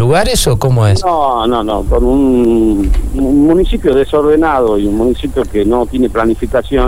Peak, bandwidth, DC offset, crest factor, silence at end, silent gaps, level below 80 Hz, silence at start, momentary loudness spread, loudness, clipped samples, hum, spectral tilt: 0 dBFS; 19.5 kHz; 4%; 10 dB; 0 s; none; -20 dBFS; 0 s; 5 LU; -12 LUFS; under 0.1%; none; -6 dB/octave